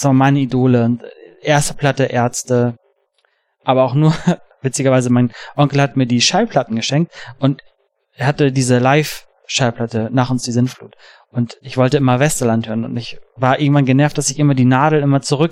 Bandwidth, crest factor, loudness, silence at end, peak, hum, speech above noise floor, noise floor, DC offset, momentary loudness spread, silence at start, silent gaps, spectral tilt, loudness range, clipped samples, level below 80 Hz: 16 kHz; 14 dB; -16 LUFS; 0 s; -2 dBFS; none; 48 dB; -63 dBFS; under 0.1%; 9 LU; 0 s; none; -5.5 dB/octave; 3 LU; under 0.1%; -46 dBFS